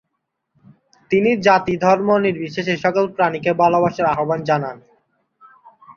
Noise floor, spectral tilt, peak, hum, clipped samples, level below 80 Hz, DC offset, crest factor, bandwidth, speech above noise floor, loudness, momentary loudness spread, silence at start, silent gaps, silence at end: -75 dBFS; -6.5 dB/octave; -2 dBFS; none; under 0.1%; -58 dBFS; under 0.1%; 18 dB; 7.2 kHz; 58 dB; -17 LUFS; 6 LU; 1.1 s; none; 0.05 s